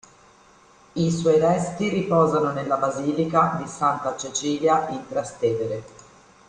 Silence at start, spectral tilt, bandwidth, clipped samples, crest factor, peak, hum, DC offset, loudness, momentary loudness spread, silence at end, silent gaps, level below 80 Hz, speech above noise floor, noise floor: 0.95 s; -5.5 dB/octave; 10 kHz; under 0.1%; 18 dB; -6 dBFS; none; under 0.1%; -23 LUFS; 9 LU; 0.6 s; none; -58 dBFS; 31 dB; -53 dBFS